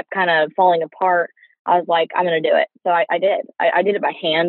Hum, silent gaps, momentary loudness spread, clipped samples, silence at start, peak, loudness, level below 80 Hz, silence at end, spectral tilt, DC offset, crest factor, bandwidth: none; 1.59-1.65 s; 4 LU; under 0.1%; 0.1 s; -4 dBFS; -18 LUFS; -86 dBFS; 0 s; -1.5 dB/octave; under 0.1%; 14 dB; 4.3 kHz